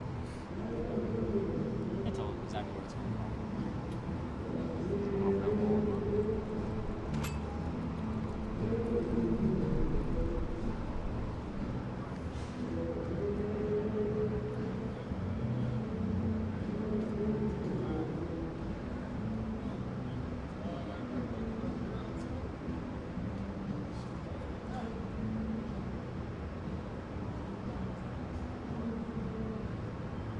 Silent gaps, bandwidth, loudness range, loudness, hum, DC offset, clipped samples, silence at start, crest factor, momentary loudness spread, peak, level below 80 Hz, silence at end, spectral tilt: none; 11 kHz; 6 LU; -37 LUFS; none; under 0.1%; under 0.1%; 0 s; 16 dB; 8 LU; -18 dBFS; -46 dBFS; 0 s; -8.5 dB/octave